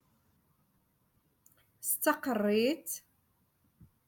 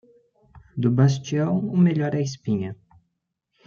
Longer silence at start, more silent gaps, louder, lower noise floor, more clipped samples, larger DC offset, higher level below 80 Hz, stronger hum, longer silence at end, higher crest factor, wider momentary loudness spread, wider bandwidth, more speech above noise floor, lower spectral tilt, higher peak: first, 1.8 s vs 0.55 s; neither; second, -32 LUFS vs -22 LUFS; second, -73 dBFS vs -77 dBFS; neither; neither; second, -78 dBFS vs -62 dBFS; neither; first, 1.1 s vs 0.9 s; first, 22 dB vs 16 dB; first, 11 LU vs 8 LU; first, 17.5 kHz vs 7.4 kHz; second, 42 dB vs 56 dB; second, -3.5 dB/octave vs -7.5 dB/octave; second, -14 dBFS vs -6 dBFS